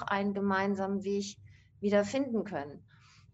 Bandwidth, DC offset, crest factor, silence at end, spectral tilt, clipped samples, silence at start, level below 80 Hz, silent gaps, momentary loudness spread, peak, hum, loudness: 8 kHz; under 0.1%; 18 dB; 0.55 s; -6 dB/octave; under 0.1%; 0 s; -66 dBFS; none; 12 LU; -14 dBFS; none; -32 LUFS